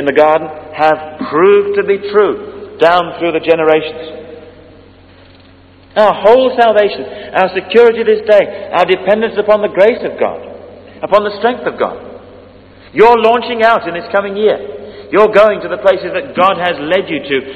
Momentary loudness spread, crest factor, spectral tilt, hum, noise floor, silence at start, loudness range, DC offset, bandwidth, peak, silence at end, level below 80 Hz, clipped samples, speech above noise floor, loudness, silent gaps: 13 LU; 12 dB; -6.5 dB/octave; none; -41 dBFS; 0 s; 5 LU; under 0.1%; 7.6 kHz; 0 dBFS; 0 s; -48 dBFS; 0.6%; 30 dB; -11 LUFS; none